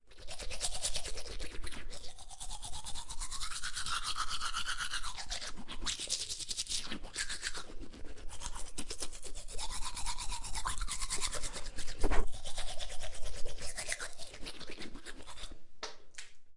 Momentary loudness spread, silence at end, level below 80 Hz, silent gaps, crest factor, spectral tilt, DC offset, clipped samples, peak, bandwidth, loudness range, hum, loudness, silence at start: 13 LU; 0 s; -44 dBFS; none; 22 dB; -1.5 dB/octave; under 0.1%; under 0.1%; -12 dBFS; 11.5 kHz; 6 LU; none; -40 LUFS; 0.05 s